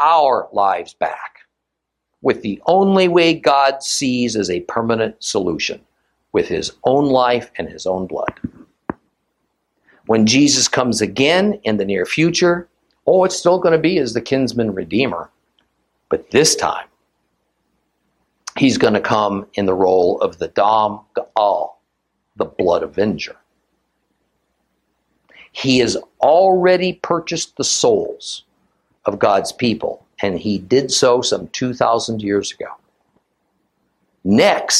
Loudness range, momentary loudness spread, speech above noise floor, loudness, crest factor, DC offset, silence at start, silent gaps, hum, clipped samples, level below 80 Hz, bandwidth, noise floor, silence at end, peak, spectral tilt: 5 LU; 13 LU; 61 dB; -17 LUFS; 18 dB; under 0.1%; 0 s; none; none; under 0.1%; -54 dBFS; 14.5 kHz; -78 dBFS; 0 s; 0 dBFS; -4 dB/octave